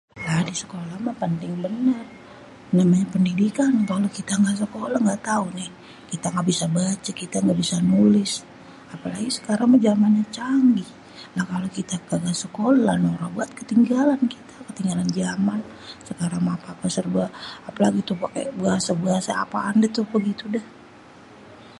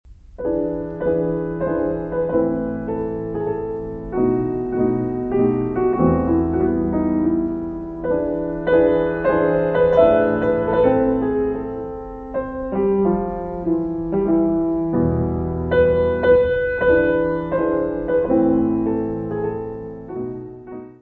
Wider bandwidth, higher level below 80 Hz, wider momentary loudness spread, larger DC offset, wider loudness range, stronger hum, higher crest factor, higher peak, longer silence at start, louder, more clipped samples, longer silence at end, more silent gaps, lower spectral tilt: first, 11.5 kHz vs 4.3 kHz; second, -60 dBFS vs -38 dBFS; about the same, 12 LU vs 11 LU; neither; about the same, 4 LU vs 5 LU; neither; about the same, 18 dB vs 16 dB; second, -6 dBFS vs -2 dBFS; about the same, 0.15 s vs 0.05 s; about the same, -22 LUFS vs -20 LUFS; neither; about the same, 0.1 s vs 0.1 s; neither; second, -5.5 dB/octave vs -10.5 dB/octave